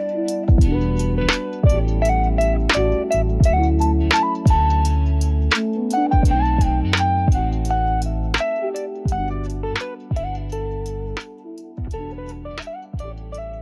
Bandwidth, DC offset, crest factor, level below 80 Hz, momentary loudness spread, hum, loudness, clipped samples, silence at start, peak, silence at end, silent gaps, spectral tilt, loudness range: 12 kHz; under 0.1%; 14 dB; -22 dBFS; 15 LU; none; -20 LUFS; under 0.1%; 0 s; -6 dBFS; 0 s; none; -6.5 dB/octave; 11 LU